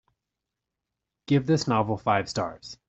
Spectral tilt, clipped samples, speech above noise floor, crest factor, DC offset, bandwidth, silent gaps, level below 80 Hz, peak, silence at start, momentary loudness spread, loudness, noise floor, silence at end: -6 dB/octave; under 0.1%; 60 dB; 20 dB; under 0.1%; 8.2 kHz; none; -60 dBFS; -8 dBFS; 1.3 s; 8 LU; -26 LUFS; -86 dBFS; 0.15 s